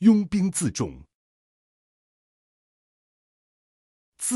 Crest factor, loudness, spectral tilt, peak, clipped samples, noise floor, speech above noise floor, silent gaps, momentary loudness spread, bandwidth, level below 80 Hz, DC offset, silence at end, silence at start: 22 dB; -25 LUFS; -5.5 dB/octave; -6 dBFS; under 0.1%; under -90 dBFS; over 69 dB; 1.14-4.12 s; 11 LU; 13.5 kHz; -56 dBFS; under 0.1%; 0 s; 0 s